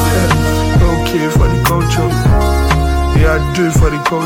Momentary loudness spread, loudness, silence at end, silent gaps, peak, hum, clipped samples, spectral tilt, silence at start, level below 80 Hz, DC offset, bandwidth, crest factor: 2 LU; -13 LUFS; 0 s; none; 0 dBFS; none; under 0.1%; -6 dB/octave; 0 s; -16 dBFS; under 0.1%; 16.5 kHz; 12 dB